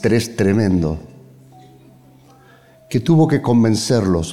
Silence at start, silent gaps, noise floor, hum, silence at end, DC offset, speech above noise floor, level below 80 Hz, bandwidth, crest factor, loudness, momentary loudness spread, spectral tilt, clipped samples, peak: 0 s; none; -48 dBFS; none; 0 s; under 0.1%; 32 dB; -44 dBFS; 16 kHz; 14 dB; -16 LUFS; 9 LU; -6.5 dB/octave; under 0.1%; -4 dBFS